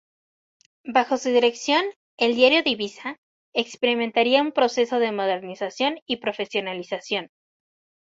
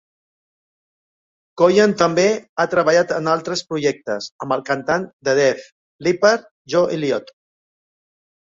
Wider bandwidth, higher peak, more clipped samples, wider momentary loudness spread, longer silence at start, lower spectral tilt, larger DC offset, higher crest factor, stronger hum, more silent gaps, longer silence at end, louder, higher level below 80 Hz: about the same, 7.8 kHz vs 7.8 kHz; about the same, -4 dBFS vs -2 dBFS; neither; first, 12 LU vs 9 LU; second, 0.85 s vs 1.55 s; second, -3 dB/octave vs -4.5 dB/octave; neither; about the same, 20 dB vs 18 dB; neither; about the same, 1.96-2.18 s, 3.18-3.52 s, 6.02-6.06 s vs 2.49-2.56 s, 4.32-4.39 s, 5.13-5.20 s, 5.72-5.99 s, 6.51-6.65 s; second, 0.8 s vs 1.35 s; second, -23 LUFS vs -18 LUFS; second, -70 dBFS vs -62 dBFS